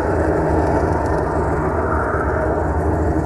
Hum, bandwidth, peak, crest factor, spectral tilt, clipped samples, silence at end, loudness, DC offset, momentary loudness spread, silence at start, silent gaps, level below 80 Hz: none; 11.5 kHz; -4 dBFS; 14 dB; -8.5 dB/octave; under 0.1%; 0 s; -19 LUFS; under 0.1%; 2 LU; 0 s; none; -26 dBFS